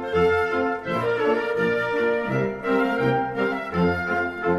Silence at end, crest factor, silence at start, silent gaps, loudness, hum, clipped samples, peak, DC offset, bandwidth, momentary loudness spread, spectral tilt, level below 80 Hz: 0 s; 14 dB; 0 s; none; -23 LUFS; none; under 0.1%; -8 dBFS; under 0.1%; 12 kHz; 4 LU; -7.5 dB/octave; -50 dBFS